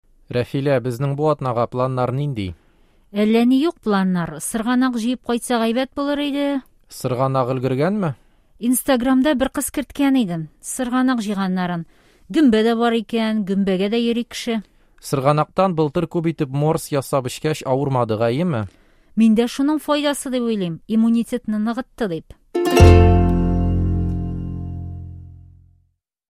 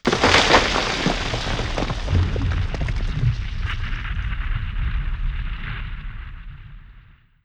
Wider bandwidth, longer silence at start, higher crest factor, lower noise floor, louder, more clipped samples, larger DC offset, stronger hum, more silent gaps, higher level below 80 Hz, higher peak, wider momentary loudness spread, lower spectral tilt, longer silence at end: first, 15.5 kHz vs 10 kHz; first, 0.3 s vs 0.05 s; about the same, 18 dB vs 22 dB; first, -65 dBFS vs -49 dBFS; about the same, -20 LUFS vs -22 LUFS; neither; neither; neither; neither; second, -32 dBFS vs -26 dBFS; about the same, 0 dBFS vs 0 dBFS; second, 11 LU vs 20 LU; first, -6.5 dB/octave vs -4.5 dB/octave; first, 0.95 s vs 0.45 s